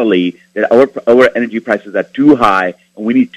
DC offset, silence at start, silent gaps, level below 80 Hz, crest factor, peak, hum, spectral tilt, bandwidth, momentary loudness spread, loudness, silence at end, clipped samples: under 0.1%; 0 s; none; -50 dBFS; 12 dB; 0 dBFS; none; -6.5 dB/octave; 11 kHz; 10 LU; -12 LUFS; 0 s; 0.6%